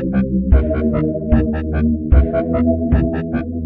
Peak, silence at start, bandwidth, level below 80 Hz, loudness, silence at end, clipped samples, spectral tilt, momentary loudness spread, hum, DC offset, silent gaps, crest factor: 0 dBFS; 0 s; 3.8 kHz; -20 dBFS; -17 LUFS; 0 s; under 0.1%; -12.5 dB/octave; 5 LU; none; under 0.1%; none; 14 dB